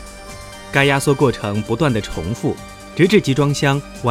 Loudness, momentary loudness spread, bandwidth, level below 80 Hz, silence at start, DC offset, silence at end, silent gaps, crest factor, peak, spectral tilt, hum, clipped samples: -17 LUFS; 17 LU; 15.5 kHz; -40 dBFS; 0 s; under 0.1%; 0 s; none; 18 dB; 0 dBFS; -5.5 dB/octave; none; under 0.1%